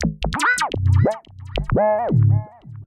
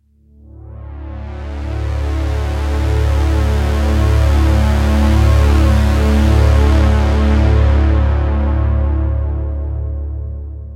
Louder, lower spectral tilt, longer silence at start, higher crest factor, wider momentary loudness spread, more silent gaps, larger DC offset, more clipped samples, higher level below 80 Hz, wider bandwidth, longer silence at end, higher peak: second, -19 LUFS vs -15 LUFS; second, -6 dB/octave vs -7.5 dB/octave; second, 0 s vs 0.55 s; about the same, 14 dB vs 12 dB; about the same, 12 LU vs 14 LU; neither; neither; neither; second, -34 dBFS vs -16 dBFS; first, 12 kHz vs 9.8 kHz; about the same, 0 s vs 0 s; second, -6 dBFS vs -2 dBFS